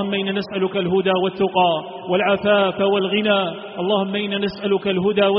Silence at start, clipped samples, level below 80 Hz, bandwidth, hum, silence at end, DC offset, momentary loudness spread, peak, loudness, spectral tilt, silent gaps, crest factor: 0 s; under 0.1%; -58 dBFS; 5.2 kHz; none; 0 s; under 0.1%; 6 LU; -4 dBFS; -20 LUFS; -3.5 dB/octave; none; 14 dB